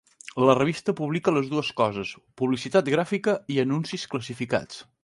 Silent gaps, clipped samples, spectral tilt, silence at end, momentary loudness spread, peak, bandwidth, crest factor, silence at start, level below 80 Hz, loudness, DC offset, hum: none; under 0.1%; -6 dB/octave; 0.2 s; 10 LU; -2 dBFS; 11.5 kHz; 22 dB; 0.25 s; -62 dBFS; -25 LUFS; under 0.1%; none